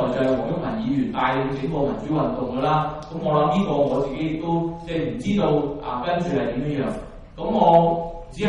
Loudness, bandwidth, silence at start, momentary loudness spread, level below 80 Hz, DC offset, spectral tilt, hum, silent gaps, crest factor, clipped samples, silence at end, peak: -22 LUFS; 11 kHz; 0 s; 8 LU; -42 dBFS; under 0.1%; -8 dB/octave; none; none; 18 dB; under 0.1%; 0 s; -4 dBFS